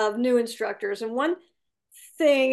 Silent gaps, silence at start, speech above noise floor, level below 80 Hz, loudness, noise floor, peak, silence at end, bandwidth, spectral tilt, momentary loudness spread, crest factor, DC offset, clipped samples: none; 0 s; 32 dB; -80 dBFS; -25 LUFS; -55 dBFS; -10 dBFS; 0 s; 12.5 kHz; -3.5 dB/octave; 8 LU; 16 dB; under 0.1%; under 0.1%